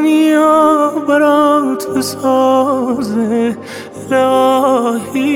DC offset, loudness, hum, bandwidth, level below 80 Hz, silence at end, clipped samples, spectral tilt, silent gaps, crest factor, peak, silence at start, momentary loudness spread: under 0.1%; -12 LUFS; none; 17 kHz; -58 dBFS; 0 s; under 0.1%; -5 dB/octave; none; 12 dB; 0 dBFS; 0 s; 7 LU